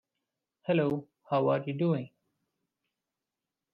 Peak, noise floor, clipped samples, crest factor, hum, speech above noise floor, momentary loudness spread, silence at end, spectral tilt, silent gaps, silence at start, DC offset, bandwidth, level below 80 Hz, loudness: -16 dBFS; -89 dBFS; under 0.1%; 18 dB; none; 60 dB; 11 LU; 1.65 s; -7 dB/octave; none; 0.65 s; under 0.1%; 5.2 kHz; -76 dBFS; -30 LUFS